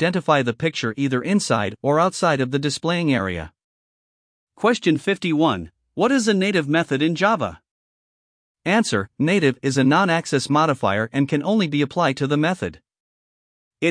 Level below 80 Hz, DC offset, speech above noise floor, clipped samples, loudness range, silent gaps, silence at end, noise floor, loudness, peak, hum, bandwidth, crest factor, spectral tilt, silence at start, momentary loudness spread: -56 dBFS; under 0.1%; over 70 dB; under 0.1%; 3 LU; 3.64-4.47 s, 7.71-8.55 s, 13.00-13.71 s; 0 s; under -90 dBFS; -20 LUFS; -2 dBFS; none; 10.5 kHz; 18 dB; -5.5 dB/octave; 0 s; 5 LU